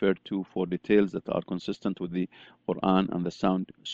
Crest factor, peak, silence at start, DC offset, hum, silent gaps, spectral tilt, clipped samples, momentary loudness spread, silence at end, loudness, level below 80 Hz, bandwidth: 20 dB; -8 dBFS; 0 s; under 0.1%; none; none; -7.5 dB/octave; under 0.1%; 9 LU; 0 s; -29 LUFS; -60 dBFS; 7.6 kHz